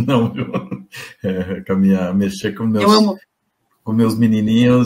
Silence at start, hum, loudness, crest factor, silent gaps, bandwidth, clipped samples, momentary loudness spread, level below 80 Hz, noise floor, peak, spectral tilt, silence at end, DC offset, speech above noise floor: 0 s; none; -17 LUFS; 16 dB; none; 16 kHz; under 0.1%; 17 LU; -52 dBFS; -67 dBFS; 0 dBFS; -6.5 dB/octave; 0 s; under 0.1%; 52 dB